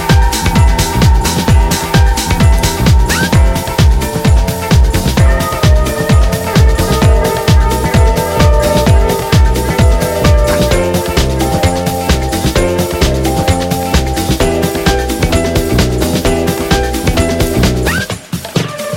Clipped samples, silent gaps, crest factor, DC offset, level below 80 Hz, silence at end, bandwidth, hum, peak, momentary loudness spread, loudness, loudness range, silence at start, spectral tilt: under 0.1%; none; 10 dB; under 0.1%; -14 dBFS; 0 s; 17 kHz; none; 0 dBFS; 3 LU; -11 LUFS; 2 LU; 0 s; -5 dB/octave